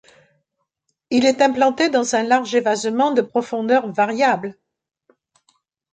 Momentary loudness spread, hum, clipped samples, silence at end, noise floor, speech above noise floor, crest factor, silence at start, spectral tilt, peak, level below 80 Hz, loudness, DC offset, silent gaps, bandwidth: 6 LU; none; under 0.1%; 1.4 s; -75 dBFS; 57 dB; 16 dB; 1.1 s; -3.5 dB/octave; -4 dBFS; -68 dBFS; -18 LUFS; under 0.1%; none; 9.4 kHz